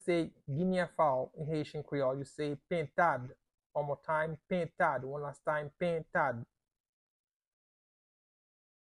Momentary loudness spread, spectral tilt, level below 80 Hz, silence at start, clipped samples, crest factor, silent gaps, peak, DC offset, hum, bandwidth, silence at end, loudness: 8 LU; -7 dB/octave; -70 dBFS; 0 s; under 0.1%; 20 dB; 3.66-3.70 s; -16 dBFS; under 0.1%; none; 11.5 kHz; 2.4 s; -35 LUFS